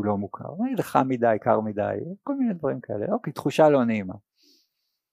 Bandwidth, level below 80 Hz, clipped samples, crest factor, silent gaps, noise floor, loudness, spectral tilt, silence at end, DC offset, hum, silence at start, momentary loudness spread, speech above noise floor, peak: 15.5 kHz; -68 dBFS; under 0.1%; 20 dB; none; -76 dBFS; -25 LUFS; -7.5 dB/octave; 0.95 s; under 0.1%; none; 0 s; 12 LU; 52 dB; -4 dBFS